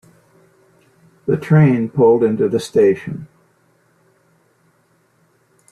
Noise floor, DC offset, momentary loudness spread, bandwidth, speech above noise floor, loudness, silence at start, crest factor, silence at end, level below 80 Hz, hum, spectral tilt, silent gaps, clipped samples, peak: -59 dBFS; under 0.1%; 15 LU; 11 kHz; 45 dB; -15 LUFS; 1.25 s; 16 dB; 2.45 s; -58 dBFS; none; -8.5 dB/octave; none; under 0.1%; -2 dBFS